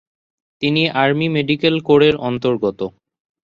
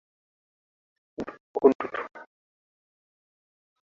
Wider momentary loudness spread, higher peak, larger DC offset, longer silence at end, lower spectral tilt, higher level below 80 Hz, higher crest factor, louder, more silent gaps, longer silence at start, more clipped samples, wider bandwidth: second, 9 LU vs 18 LU; first, -2 dBFS vs -6 dBFS; neither; second, 0.55 s vs 1.65 s; first, -7.5 dB/octave vs -5 dB/octave; first, -52 dBFS vs -70 dBFS; second, 16 dB vs 26 dB; first, -16 LUFS vs -26 LUFS; second, none vs 1.40-1.54 s, 1.75-1.79 s; second, 0.6 s vs 1.2 s; neither; about the same, 7 kHz vs 6.6 kHz